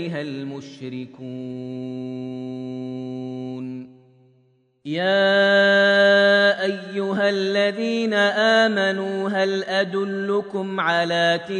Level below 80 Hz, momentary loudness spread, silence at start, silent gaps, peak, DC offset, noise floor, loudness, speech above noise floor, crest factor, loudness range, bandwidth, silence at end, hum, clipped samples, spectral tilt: -74 dBFS; 18 LU; 0 s; none; -6 dBFS; under 0.1%; -61 dBFS; -20 LUFS; 40 dB; 16 dB; 14 LU; 10 kHz; 0 s; none; under 0.1%; -5 dB/octave